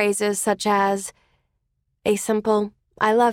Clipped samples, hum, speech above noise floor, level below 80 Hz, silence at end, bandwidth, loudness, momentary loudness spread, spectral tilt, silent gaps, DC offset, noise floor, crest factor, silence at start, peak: under 0.1%; none; 52 dB; -60 dBFS; 0 s; 17 kHz; -22 LUFS; 8 LU; -4 dB/octave; none; under 0.1%; -73 dBFS; 16 dB; 0 s; -6 dBFS